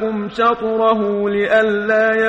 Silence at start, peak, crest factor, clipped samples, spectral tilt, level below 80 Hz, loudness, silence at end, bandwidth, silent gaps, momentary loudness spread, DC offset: 0 s; -2 dBFS; 14 dB; under 0.1%; -6.5 dB/octave; -52 dBFS; -16 LUFS; 0 s; 8 kHz; none; 3 LU; under 0.1%